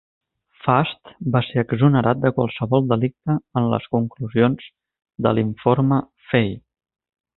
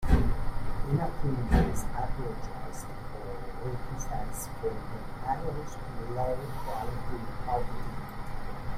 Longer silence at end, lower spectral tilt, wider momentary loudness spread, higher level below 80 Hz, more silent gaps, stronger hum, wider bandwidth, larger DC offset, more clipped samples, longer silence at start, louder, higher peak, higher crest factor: first, 0.8 s vs 0 s; first, -12.5 dB/octave vs -6.5 dB/octave; second, 7 LU vs 13 LU; second, -52 dBFS vs -34 dBFS; neither; neither; second, 4.1 kHz vs 15 kHz; neither; neither; first, 0.65 s vs 0 s; first, -20 LUFS vs -35 LUFS; first, -2 dBFS vs -10 dBFS; about the same, 20 dB vs 20 dB